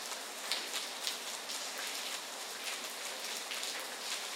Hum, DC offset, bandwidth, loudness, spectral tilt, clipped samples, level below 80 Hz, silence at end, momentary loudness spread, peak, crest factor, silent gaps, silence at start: none; under 0.1%; 18 kHz; -38 LUFS; 1.5 dB/octave; under 0.1%; under -90 dBFS; 0 s; 3 LU; -12 dBFS; 30 dB; none; 0 s